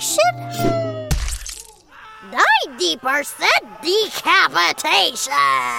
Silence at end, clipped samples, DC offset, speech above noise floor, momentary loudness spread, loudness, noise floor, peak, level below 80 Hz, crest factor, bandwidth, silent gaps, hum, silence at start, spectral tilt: 0 s; under 0.1%; under 0.1%; 25 dB; 10 LU; -17 LUFS; -42 dBFS; -2 dBFS; -34 dBFS; 18 dB; 17 kHz; none; none; 0 s; -2.5 dB/octave